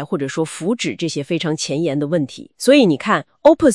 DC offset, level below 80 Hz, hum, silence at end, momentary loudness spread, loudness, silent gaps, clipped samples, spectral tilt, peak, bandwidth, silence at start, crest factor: 0.1%; -56 dBFS; none; 0 s; 10 LU; -18 LUFS; none; under 0.1%; -5 dB/octave; 0 dBFS; 12 kHz; 0 s; 16 dB